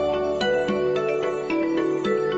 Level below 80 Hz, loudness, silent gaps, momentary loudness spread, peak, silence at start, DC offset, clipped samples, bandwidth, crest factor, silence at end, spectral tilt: -52 dBFS; -23 LUFS; none; 2 LU; -12 dBFS; 0 s; under 0.1%; under 0.1%; 8.2 kHz; 10 dB; 0 s; -6 dB/octave